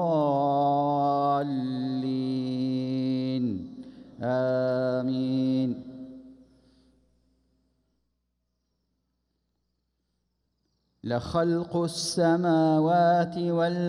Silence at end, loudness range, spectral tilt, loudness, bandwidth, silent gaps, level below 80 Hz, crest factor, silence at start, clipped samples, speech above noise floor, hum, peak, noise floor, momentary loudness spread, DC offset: 0 s; 9 LU; -6.5 dB/octave; -26 LUFS; 11.5 kHz; none; -62 dBFS; 16 dB; 0 s; under 0.1%; 54 dB; 60 Hz at -65 dBFS; -12 dBFS; -78 dBFS; 13 LU; under 0.1%